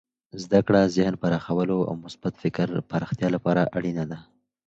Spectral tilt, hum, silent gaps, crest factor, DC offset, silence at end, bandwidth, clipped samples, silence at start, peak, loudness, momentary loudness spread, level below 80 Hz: -7.5 dB/octave; none; none; 20 dB; under 0.1%; 0.45 s; 8 kHz; under 0.1%; 0.35 s; -4 dBFS; -25 LUFS; 13 LU; -56 dBFS